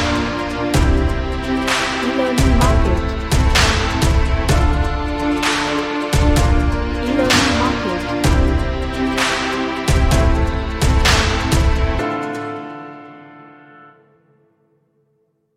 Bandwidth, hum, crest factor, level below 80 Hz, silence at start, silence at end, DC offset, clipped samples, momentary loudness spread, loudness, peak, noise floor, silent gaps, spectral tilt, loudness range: 15 kHz; none; 16 dB; -20 dBFS; 0 s; 2.05 s; under 0.1%; under 0.1%; 7 LU; -17 LUFS; 0 dBFS; -64 dBFS; none; -5 dB/octave; 6 LU